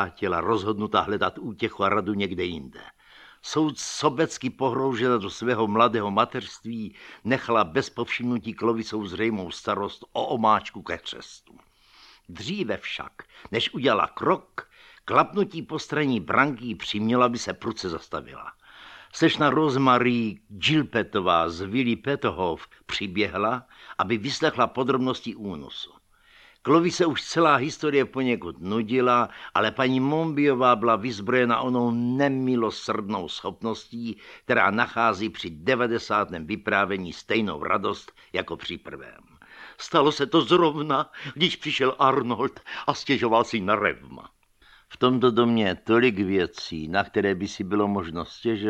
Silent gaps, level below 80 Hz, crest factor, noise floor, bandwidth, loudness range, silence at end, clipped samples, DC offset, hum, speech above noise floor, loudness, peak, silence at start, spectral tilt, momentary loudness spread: none; -58 dBFS; 20 dB; -57 dBFS; 11.5 kHz; 5 LU; 0 s; under 0.1%; under 0.1%; none; 32 dB; -24 LUFS; -4 dBFS; 0 s; -5 dB/octave; 14 LU